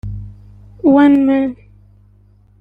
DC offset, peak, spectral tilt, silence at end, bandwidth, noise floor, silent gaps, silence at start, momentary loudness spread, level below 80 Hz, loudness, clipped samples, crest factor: under 0.1%; -2 dBFS; -9 dB/octave; 1.05 s; 4 kHz; -49 dBFS; none; 0.05 s; 19 LU; -40 dBFS; -13 LUFS; under 0.1%; 14 dB